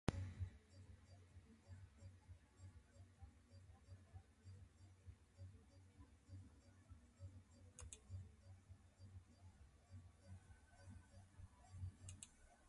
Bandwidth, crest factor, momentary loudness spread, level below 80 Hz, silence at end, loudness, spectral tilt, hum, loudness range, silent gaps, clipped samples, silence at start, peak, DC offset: 11 kHz; 36 dB; 11 LU; -66 dBFS; 0 s; -62 LUFS; -5.5 dB/octave; none; 4 LU; none; under 0.1%; 0.05 s; -22 dBFS; under 0.1%